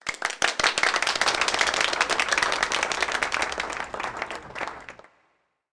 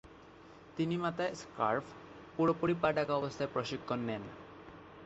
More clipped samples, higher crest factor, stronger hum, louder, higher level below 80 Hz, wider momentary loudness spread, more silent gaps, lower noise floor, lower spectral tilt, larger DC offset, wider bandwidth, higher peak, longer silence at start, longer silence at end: neither; about the same, 20 dB vs 20 dB; neither; first, -24 LUFS vs -35 LUFS; first, -54 dBFS vs -66 dBFS; second, 12 LU vs 21 LU; neither; first, -70 dBFS vs -56 dBFS; second, 0 dB/octave vs -5 dB/octave; neither; first, 10.5 kHz vs 8 kHz; first, -8 dBFS vs -16 dBFS; about the same, 0.05 s vs 0.05 s; first, 0.75 s vs 0 s